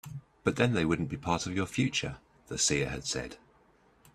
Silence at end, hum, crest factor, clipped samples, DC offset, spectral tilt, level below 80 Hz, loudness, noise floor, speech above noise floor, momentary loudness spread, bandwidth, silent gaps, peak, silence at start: 0.8 s; none; 22 dB; under 0.1%; under 0.1%; -4 dB/octave; -54 dBFS; -31 LUFS; -64 dBFS; 33 dB; 13 LU; 15 kHz; none; -10 dBFS; 0.05 s